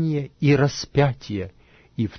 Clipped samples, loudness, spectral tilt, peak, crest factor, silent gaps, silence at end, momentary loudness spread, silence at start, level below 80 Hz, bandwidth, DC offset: under 0.1%; -22 LUFS; -6.5 dB/octave; -4 dBFS; 18 dB; none; 0 s; 15 LU; 0 s; -48 dBFS; 6.6 kHz; under 0.1%